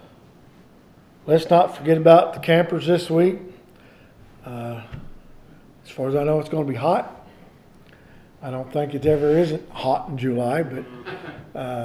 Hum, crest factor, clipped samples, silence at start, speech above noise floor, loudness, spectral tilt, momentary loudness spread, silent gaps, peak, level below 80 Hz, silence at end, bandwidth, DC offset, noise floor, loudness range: none; 20 dB; under 0.1%; 1.25 s; 30 dB; -20 LUFS; -7.5 dB/octave; 20 LU; none; -2 dBFS; -52 dBFS; 0 s; 14 kHz; under 0.1%; -50 dBFS; 9 LU